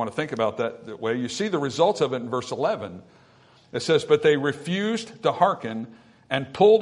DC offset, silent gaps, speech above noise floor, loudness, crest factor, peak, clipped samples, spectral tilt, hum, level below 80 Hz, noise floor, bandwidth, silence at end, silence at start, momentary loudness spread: under 0.1%; none; 32 dB; -24 LUFS; 20 dB; -4 dBFS; under 0.1%; -5 dB/octave; none; -68 dBFS; -55 dBFS; 11 kHz; 0 s; 0 s; 12 LU